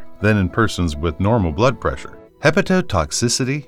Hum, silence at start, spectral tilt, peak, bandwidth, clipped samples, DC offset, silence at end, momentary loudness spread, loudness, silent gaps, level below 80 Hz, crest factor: none; 0 s; -5 dB/octave; -2 dBFS; 15.5 kHz; under 0.1%; under 0.1%; 0.05 s; 7 LU; -18 LUFS; none; -34 dBFS; 16 dB